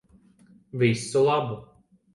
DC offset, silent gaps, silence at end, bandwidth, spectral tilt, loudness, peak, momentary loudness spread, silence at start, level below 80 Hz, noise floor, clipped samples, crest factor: under 0.1%; none; 0.5 s; 11.5 kHz; -6 dB/octave; -24 LUFS; -8 dBFS; 16 LU; 0.75 s; -64 dBFS; -57 dBFS; under 0.1%; 18 dB